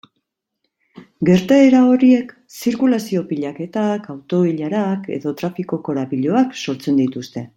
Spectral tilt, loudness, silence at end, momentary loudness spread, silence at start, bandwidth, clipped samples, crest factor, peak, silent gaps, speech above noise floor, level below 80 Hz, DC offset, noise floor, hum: -7 dB/octave; -17 LUFS; 0.1 s; 13 LU; 0.95 s; 16.5 kHz; under 0.1%; 16 dB; -2 dBFS; none; 57 dB; -60 dBFS; under 0.1%; -74 dBFS; none